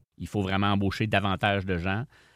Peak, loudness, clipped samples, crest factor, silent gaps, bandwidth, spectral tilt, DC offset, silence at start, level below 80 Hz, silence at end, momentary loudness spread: -8 dBFS; -27 LUFS; under 0.1%; 20 dB; none; 13.5 kHz; -6.5 dB/octave; under 0.1%; 0.2 s; -52 dBFS; 0.3 s; 6 LU